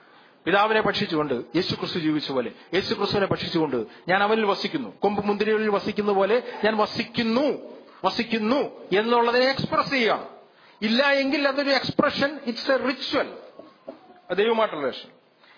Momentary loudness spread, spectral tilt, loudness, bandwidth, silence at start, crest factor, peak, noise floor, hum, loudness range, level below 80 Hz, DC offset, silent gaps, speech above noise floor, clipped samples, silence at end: 9 LU; -5.5 dB/octave; -24 LUFS; 5.4 kHz; 0.45 s; 20 dB; -6 dBFS; -44 dBFS; none; 3 LU; -62 dBFS; under 0.1%; none; 21 dB; under 0.1%; 0.5 s